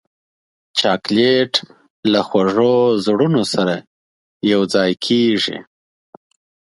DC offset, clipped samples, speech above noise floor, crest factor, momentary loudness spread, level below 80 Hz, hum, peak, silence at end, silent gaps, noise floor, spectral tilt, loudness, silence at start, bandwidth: under 0.1%; under 0.1%; over 74 dB; 18 dB; 8 LU; -60 dBFS; none; 0 dBFS; 1.05 s; 1.90-2.03 s, 3.87-4.40 s; under -90 dBFS; -5 dB/octave; -16 LUFS; 0.75 s; 11.5 kHz